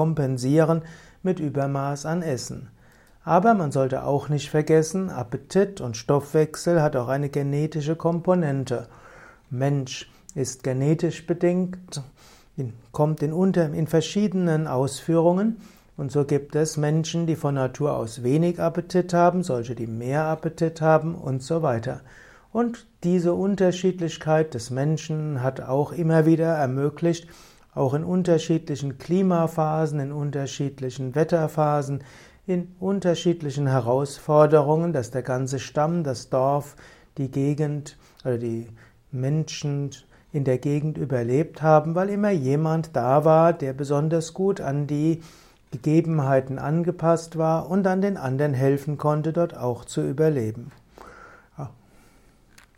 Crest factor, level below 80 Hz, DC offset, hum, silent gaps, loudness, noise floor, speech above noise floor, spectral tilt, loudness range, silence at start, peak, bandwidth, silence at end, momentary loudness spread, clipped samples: 18 dB; -56 dBFS; under 0.1%; none; none; -24 LUFS; -55 dBFS; 32 dB; -7 dB/octave; 4 LU; 0 s; -4 dBFS; 15 kHz; 1.05 s; 11 LU; under 0.1%